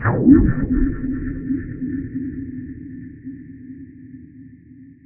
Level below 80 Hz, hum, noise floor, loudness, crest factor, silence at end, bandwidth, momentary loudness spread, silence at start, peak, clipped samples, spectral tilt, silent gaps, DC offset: -30 dBFS; none; -44 dBFS; -20 LUFS; 20 dB; 0.15 s; 2.6 kHz; 26 LU; 0 s; 0 dBFS; under 0.1%; -12.5 dB/octave; none; under 0.1%